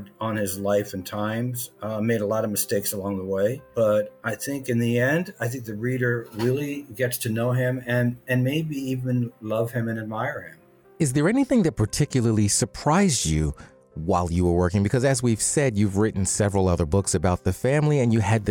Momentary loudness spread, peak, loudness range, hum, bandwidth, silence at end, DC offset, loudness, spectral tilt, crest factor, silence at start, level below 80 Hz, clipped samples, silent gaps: 8 LU; -8 dBFS; 4 LU; none; 19.5 kHz; 0 s; under 0.1%; -24 LUFS; -5.5 dB/octave; 16 dB; 0 s; -46 dBFS; under 0.1%; none